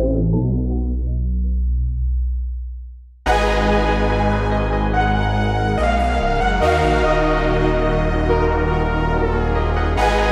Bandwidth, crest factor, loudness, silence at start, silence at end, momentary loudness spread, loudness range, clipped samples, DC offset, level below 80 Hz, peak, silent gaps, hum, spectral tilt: 10.5 kHz; 14 dB; -19 LUFS; 0 s; 0 s; 6 LU; 4 LU; under 0.1%; under 0.1%; -22 dBFS; -4 dBFS; none; none; -7 dB/octave